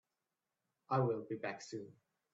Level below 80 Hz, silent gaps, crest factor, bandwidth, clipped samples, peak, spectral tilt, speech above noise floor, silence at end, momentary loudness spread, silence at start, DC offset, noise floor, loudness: -82 dBFS; none; 20 dB; 8 kHz; under 0.1%; -22 dBFS; -6.5 dB/octave; over 51 dB; 0.45 s; 14 LU; 0.9 s; under 0.1%; under -90 dBFS; -40 LUFS